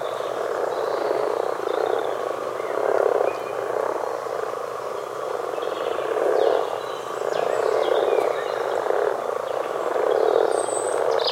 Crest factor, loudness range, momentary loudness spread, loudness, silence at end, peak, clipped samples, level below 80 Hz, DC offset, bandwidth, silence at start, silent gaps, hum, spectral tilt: 18 dB; 3 LU; 7 LU; -24 LUFS; 0 s; -6 dBFS; under 0.1%; -72 dBFS; under 0.1%; 16.5 kHz; 0 s; none; none; -3 dB/octave